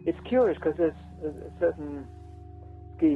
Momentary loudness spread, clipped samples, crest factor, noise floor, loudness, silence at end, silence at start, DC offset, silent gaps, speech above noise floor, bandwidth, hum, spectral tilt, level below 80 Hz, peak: 22 LU; under 0.1%; 16 dB; -44 dBFS; -28 LUFS; 0 s; 0 s; under 0.1%; none; 17 dB; 4.4 kHz; none; -9 dB/octave; -48 dBFS; -12 dBFS